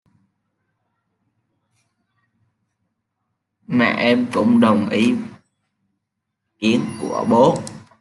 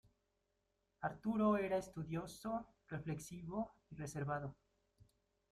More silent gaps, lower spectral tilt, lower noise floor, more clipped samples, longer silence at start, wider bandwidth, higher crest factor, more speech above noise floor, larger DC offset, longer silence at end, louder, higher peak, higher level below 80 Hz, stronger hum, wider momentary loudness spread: neither; about the same, -6 dB/octave vs -7 dB/octave; second, -78 dBFS vs -85 dBFS; neither; first, 3.7 s vs 1 s; second, 11.5 kHz vs 14 kHz; about the same, 18 dB vs 20 dB; first, 62 dB vs 43 dB; neither; second, 0.2 s vs 0.5 s; first, -18 LUFS vs -43 LUFS; first, -2 dBFS vs -24 dBFS; first, -64 dBFS vs -70 dBFS; neither; about the same, 11 LU vs 13 LU